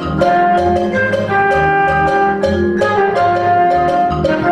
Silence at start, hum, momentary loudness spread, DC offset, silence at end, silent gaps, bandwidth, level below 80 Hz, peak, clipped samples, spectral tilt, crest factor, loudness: 0 s; none; 3 LU; under 0.1%; 0 s; none; 11 kHz; -38 dBFS; -2 dBFS; under 0.1%; -7 dB/octave; 12 dB; -13 LUFS